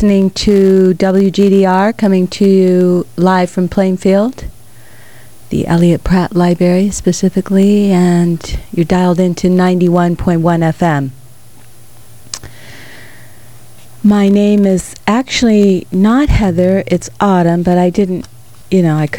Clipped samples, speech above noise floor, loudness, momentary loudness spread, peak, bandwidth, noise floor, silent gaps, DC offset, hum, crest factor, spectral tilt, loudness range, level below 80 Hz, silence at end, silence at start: under 0.1%; 31 dB; -11 LUFS; 8 LU; 0 dBFS; 17 kHz; -41 dBFS; none; 2%; none; 10 dB; -7 dB/octave; 5 LU; -30 dBFS; 0 s; 0 s